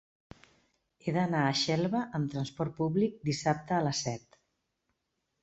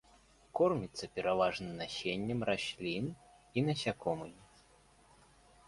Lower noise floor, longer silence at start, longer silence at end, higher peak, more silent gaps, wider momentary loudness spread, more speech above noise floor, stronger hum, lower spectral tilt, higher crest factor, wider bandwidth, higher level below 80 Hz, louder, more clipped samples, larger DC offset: first, -82 dBFS vs -65 dBFS; first, 1.05 s vs 0.55 s; about the same, 1.25 s vs 1.25 s; first, -14 dBFS vs -18 dBFS; neither; second, 7 LU vs 10 LU; first, 51 dB vs 29 dB; neither; about the same, -5 dB/octave vs -5.5 dB/octave; about the same, 20 dB vs 20 dB; second, 8.2 kHz vs 11.5 kHz; about the same, -66 dBFS vs -66 dBFS; first, -31 LUFS vs -36 LUFS; neither; neither